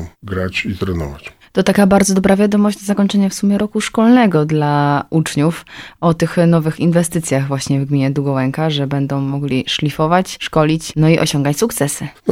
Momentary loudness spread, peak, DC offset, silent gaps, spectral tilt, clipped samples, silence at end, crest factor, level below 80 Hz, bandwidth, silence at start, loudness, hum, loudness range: 8 LU; 0 dBFS; under 0.1%; none; -5.5 dB/octave; under 0.1%; 0 s; 14 dB; -42 dBFS; 16 kHz; 0 s; -15 LUFS; none; 3 LU